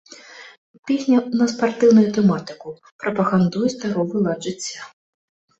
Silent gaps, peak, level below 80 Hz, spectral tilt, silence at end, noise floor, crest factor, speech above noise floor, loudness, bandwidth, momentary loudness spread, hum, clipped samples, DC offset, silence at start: 0.58-0.83 s, 2.92-2.99 s; -4 dBFS; -62 dBFS; -6.5 dB/octave; 0.7 s; -42 dBFS; 16 dB; 23 dB; -19 LUFS; 8.2 kHz; 23 LU; none; under 0.1%; under 0.1%; 0.1 s